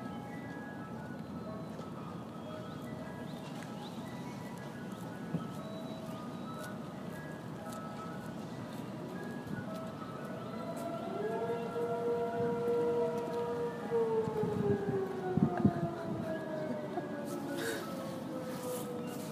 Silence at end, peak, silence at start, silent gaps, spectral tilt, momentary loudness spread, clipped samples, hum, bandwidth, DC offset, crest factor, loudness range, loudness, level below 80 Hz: 0 s; -16 dBFS; 0 s; none; -6.5 dB/octave; 11 LU; under 0.1%; none; 15.5 kHz; under 0.1%; 22 dB; 10 LU; -38 LUFS; -68 dBFS